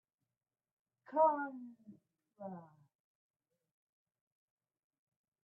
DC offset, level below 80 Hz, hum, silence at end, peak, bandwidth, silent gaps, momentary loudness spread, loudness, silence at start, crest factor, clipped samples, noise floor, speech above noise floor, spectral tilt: under 0.1%; under -90 dBFS; none; 2.75 s; -20 dBFS; 3 kHz; none; 22 LU; -35 LUFS; 1.1 s; 24 dB; under 0.1%; under -90 dBFS; over 53 dB; -1 dB/octave